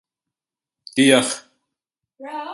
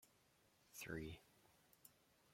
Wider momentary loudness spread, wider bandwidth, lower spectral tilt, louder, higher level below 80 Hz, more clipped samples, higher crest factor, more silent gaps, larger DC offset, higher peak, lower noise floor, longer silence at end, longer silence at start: about the same, 17 LU vs 17 LU; second, 11.5 kHz vs 16.5 kHz; second, -3 dB/octave vs -4.5 dB/octave; first, -17 LUFS vs -54 LUFS; about the same, -68 dBFS vs -72 dBFS; neither; about the same, 22 dB vs 24 dB; neither; neither; first, -2 dBFS vs -36 dBFS; first, -89 dBFS vs -77 dBFS; about the same, 0 s vs 0 s; first, 0.95 s vs 0 s